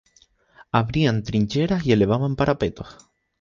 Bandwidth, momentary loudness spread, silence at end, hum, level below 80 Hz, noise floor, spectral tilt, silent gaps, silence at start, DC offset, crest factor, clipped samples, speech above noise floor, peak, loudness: 7.4 kHz; 8 LU; 0.5 s; none; -44 dBFS; -59 dBFS; -7.5 dB/octave; none; 0.75 s; under 0.1%; 20 dB; under 0.1%; 38 dB; -2 dBFS; -22 LUFS